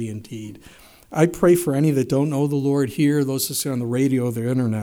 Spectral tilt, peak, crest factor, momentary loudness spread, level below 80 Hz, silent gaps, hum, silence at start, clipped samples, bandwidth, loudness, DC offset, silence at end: -6 dB/octave; -4 dBFS; 18 dB; 13 LU; -54 dBFS; none; none; 0 s; under 0.1%; over 20 kHz; -20 LUFS; under 0.1%; 0 s